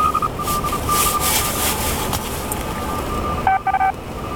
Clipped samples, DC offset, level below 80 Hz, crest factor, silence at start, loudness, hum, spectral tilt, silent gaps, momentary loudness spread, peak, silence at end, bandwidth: under 0.1%; under 0.1%; -32 dBFS; 18 dB; 0 s; -19 LUFS; none; -3 dB/octave; none; 7 LU; -2 dBFS; 0 s; 17.5 kHz